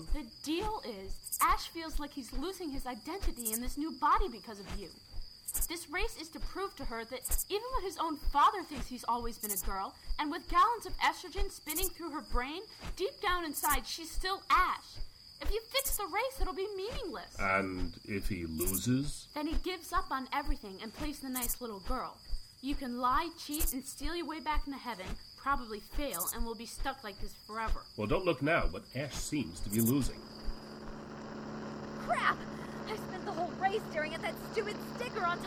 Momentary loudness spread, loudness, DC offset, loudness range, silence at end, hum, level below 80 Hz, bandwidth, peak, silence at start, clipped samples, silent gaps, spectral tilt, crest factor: 13 LU; -36 LUFS; under 0.1%; 4 LU; 0 s; none; -42 dBFS; 18 kHz; -14 dBFS; 0 s; under 0.1%; none; -3.5 dB/octave; 22 dB